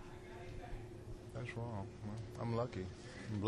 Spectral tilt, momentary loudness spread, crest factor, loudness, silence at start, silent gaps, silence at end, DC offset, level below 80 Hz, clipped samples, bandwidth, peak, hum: -7 dB/octave; 11 LU; 22 dB; -46 LUFS; 0 s; none; 0 s; under 0.1%; -56 dBFS; under 0.1%; 12 kHz; -22 dBFS; none